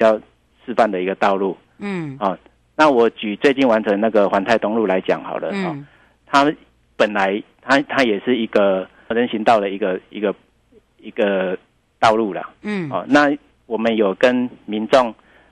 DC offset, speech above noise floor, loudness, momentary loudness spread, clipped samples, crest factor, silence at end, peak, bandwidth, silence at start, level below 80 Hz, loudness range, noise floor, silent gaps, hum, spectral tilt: under 0.1%; 37 dB; -18 LUFS; 11 LU; under 0.1%; 16 dB; 0.4 s; -4 dBFS; 11 kHz; 0 s; -58 dBFS; 3 LU; -55 dBFS; none; none; -5.5 dB/octave